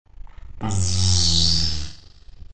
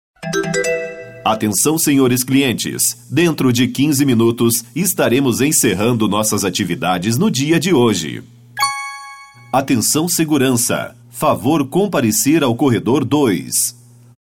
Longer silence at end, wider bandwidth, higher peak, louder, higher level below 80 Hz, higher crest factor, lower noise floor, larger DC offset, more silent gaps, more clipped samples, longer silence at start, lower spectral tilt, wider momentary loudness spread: second, 0 s vs 0.5 s; second, 9.2 kHz vs 19 kHz; about the same, -4 dBFS vs -4 dBFS; second, -19 LUFS vs -15 LUFS; first, -36 dBFS vs -54 dBFS; about the same, 16 dB vs 12 dB; first, -44 dBFS vs -37 dBFS; second, under 0.1% vs 0.1%; neither; neither; second, 0.05 s vs 0.2 s; about the same, -3 dB/octave vs -4 dB/octave; first, 15 LU vs 8 LU